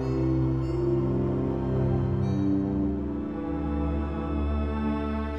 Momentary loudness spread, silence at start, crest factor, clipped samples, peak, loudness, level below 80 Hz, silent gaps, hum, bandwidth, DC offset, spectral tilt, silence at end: 5 LU; 0 s; 12 dB; under 0.1%; -14 dBFS; -28 LUFS; -34 dBFS; none; none; 6.2 kHz; 0.3%; -10 dB/octave; 0 s